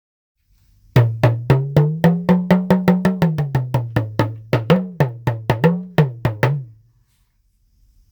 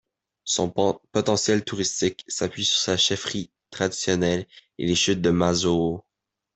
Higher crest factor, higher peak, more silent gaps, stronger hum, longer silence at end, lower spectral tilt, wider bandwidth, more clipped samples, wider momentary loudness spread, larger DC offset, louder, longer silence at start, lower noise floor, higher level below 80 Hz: about the same, 18 dB vs 18 dB; first, 0 dBFS vs -6 dBFS; neither; neither; first, 1.45 s vs 0.55 s; first, -8.5 dB/octave vs -3.5 dB/octave; first, over 20 kHz vs 8.4 kHz; neither; second, 6 LU vs 9 LU; neither; first, -18 LUFS vs -23 LUFS; first, 0.95 s vs 0.45 s; second, -61 dBFS vs -84 dBFS; first, -44 dBFS vs -56 dBFS